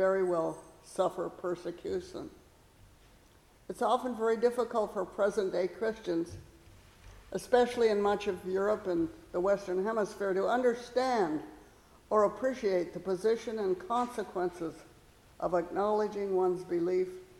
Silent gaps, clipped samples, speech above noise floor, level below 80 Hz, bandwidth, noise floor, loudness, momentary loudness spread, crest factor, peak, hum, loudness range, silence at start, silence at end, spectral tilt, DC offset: none; under 0.1%; 30 dB; -62 dBFS; 14.5 kHz; -61 dBFS; -32 LUFS; 10 LU; 18 dB; -14 dBFS; none; 4 LU; 0 s; 0.15 s; -5.5 dB/octave; under 0.1%